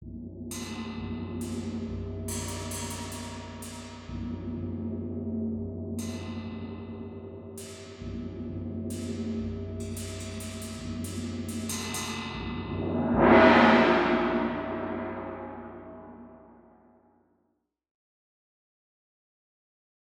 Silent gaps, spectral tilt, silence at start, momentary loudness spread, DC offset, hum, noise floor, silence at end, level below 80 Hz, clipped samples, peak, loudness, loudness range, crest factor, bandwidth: none; -5 dB/octave; 0 s; 18 LU; under 0.1%; none; -76 dBFS; 3.6 s; -50 dBFS; under 0.1%; -6 dBFS; -29 LUFS; 15 LU; 26 dB; 19.5 kHz